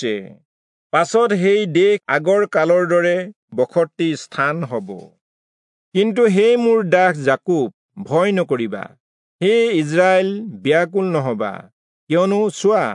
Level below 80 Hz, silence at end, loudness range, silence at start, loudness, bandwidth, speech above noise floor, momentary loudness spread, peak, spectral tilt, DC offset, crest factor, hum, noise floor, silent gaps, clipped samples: -74 dBFS; 0 s; 3 LU; 0 s; -17 LUFS; 11 kHz; over 73 dB; 12 LU; -2 dBFS; -6 dB/octave; under 0.1%; 16 dB; none; under -90 dBFS; 0.45-0.90 s, 3.36-3.48 s, 5.21-5.92 s, 7.74-7.89 s, 9.00-9.39 s, 11.73-12.07 s; under 0.1%